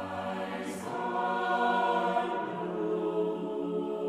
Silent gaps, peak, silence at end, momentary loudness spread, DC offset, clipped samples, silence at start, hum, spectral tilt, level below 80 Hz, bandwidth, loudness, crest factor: none; -16 dBFS; 0 s; 8 LU; under 0.1%; under 0.1%; 0 s; none; -5.5 dB/octave; -72 dBFS; 14 kHz; -31 LUFS; 14 dB